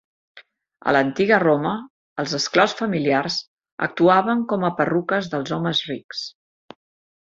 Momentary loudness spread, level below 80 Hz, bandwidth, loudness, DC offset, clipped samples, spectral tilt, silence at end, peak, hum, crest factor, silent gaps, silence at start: 13 LU; -64 dBFS; 7.8 kHz; -21 LUFS; under 0.1%; under 0.1%; -5 dB/octave; 0.95 s; -2 dBFS; none; 20 dB; 1.90-2.16 s, 3.48-3.57 s, 3.72-3.78 s, 6.04-6.09 s; 0.35 s